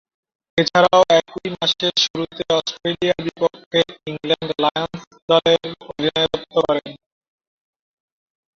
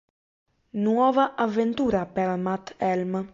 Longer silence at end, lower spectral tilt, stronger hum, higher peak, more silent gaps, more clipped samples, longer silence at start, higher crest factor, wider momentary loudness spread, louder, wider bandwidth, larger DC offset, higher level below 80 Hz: first, 1.6 s vs 0.05 s; second, -4 dB/octave vs -7.5 dB/octave; neither; first, -2 dBFS vs -8 dBFS; first, 2.10-2.14 s, 3.66-3.71 s, 5.07-5.11 s, 5.22-5.28 s vs none; neither; second, 0.55 s vs 0.75 s; about the same, 18 dB vs 16 dB; first, 12 LU vs 7 LU; first, -19 LUFS vs -25 LUFS; about the same, 7.4 kHz vs 7.6 kHz; neither; about the same, -56 dBFS vs -58 dBFS